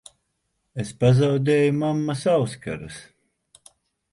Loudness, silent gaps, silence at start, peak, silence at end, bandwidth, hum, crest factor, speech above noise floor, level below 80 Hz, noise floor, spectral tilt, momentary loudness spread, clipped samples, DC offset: -22 LUFS; none; 0.75 s; -6 dBFS; 1.1 s; 11.5 kHz; none; 18 dB; 53 dB; -54 dBFS; -74 dBFS; -7 dB/octave; 17 LU; under 0.1%; under 0.1%